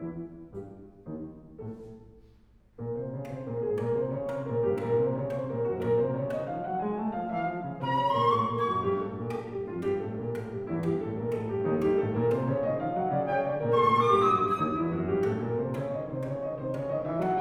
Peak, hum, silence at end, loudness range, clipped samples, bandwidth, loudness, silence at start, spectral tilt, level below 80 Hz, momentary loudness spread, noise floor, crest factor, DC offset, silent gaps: -12 dBFS; none; 0 s; 9 LU; under 0.1%; 12 kHz; -29 LUFS; 0 s; -8.5 dB/octave; -58 dBFS; 16 LU; -58 dBFS; 18 dB; under 0.1%; none